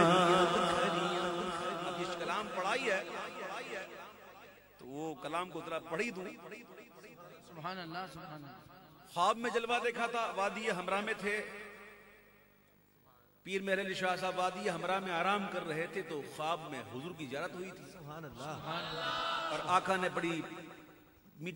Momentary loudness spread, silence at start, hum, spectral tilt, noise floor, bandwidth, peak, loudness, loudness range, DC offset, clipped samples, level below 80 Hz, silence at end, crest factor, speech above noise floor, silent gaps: 19 LU; 0 s; none; -4.5 dB/octave; -67 dBFS; 16 kHz; -12 dBFS; -36 LUFS; 7 LU; under 0.1%; under 0.1%; -72 dBFS; 0 s; 24 dB; 30 dB; none